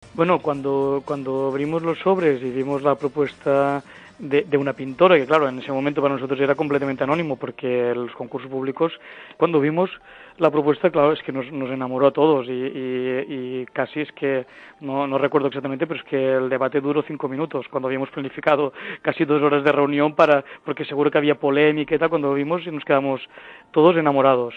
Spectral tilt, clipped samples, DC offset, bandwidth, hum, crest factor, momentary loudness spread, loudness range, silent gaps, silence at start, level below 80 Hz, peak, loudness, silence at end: -8 dB/octave; under 0.1%; under 0.1%; 8.2 kHz; none; 20 dB; 10 LU; 4 LU; none; 0.05 s; -64 dBFS; -2 dBFS; -21 LUFS; 0 s